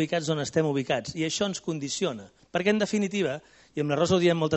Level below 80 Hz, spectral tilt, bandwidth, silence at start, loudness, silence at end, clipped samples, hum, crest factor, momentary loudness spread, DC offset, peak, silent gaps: -62 dBFS; -5 dB/octave; 8.2 kHz; 0 s; -27 LUFS; 0 s; under 0.1%; none; 18 dB; 9 LU; under 0.1%; -10 dBFS; none